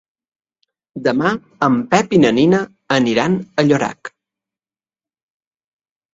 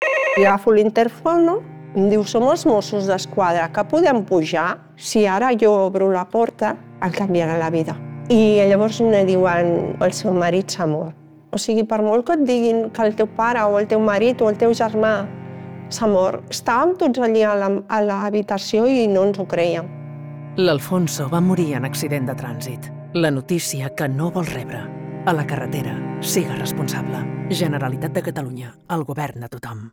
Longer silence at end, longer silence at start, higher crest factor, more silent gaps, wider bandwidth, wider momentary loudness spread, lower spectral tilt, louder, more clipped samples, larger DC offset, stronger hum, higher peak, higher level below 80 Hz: first, 2.05 s vs 0.05 s; first, 0.95 s vs 0 s; about the same, 18 dB vs 16 dB; neither; second, 7.8 kHz vs 20 kHz; about the same, 10 LU vs 12 LU; about the same, -6 dB/octave vs -5.5 dB/octave; first, -16 LUFS vs -19 LUFS; neither; neither; neither; about the same, 0 dBFS vs -2 dBFS; about the same, -56 dBFS vs -58 dBFS